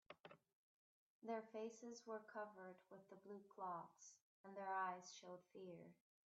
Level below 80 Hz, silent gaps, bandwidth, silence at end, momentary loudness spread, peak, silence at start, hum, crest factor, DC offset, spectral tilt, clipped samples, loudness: under -90 dBFS; 0.55-1.22 s, 4.21-4.44 s; 8 kHz; 0.45 s; 17 LU; -36 dBFS; 0.1 s; none; 18 dB; under 0.1%; -3.5 dB/octave; under 0.1%; -54 LUFS